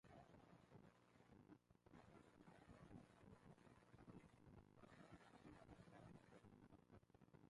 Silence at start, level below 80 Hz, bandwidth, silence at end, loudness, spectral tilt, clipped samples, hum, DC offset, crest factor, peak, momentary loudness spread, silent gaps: 0.05 s; -80 dBFS; 11 kHz; 0 s; -68 LUFS; -6.5 dB/octave; under 0.1%; none; under 0.1%; 18 dB; -50 dBFS; 4 LU; none